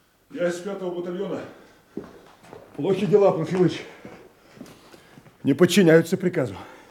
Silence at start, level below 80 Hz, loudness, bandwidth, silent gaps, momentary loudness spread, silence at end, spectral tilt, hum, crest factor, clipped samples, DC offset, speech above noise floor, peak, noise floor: 0.35 s; -66 dBFS; -22 LUFS; 17 kHz; none; 24 LU; 0.15 s; -6 dB/octave; none; 20 dB; under 0.1%; under 0.1%; 29 dB; -4 dBFS; -50 dBFS